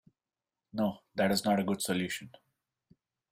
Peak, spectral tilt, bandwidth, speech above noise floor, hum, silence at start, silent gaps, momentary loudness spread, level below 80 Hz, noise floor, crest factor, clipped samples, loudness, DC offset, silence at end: -14 dBFS; -4.5 dB/octave; 16 kHz; over 59 dB; none; 0.75 s; none; 9 LU; -68 dBFS; under -90 dBFS; 20 dB; under 0.1%; -32 LUFS; under 0.1%; 1.05 s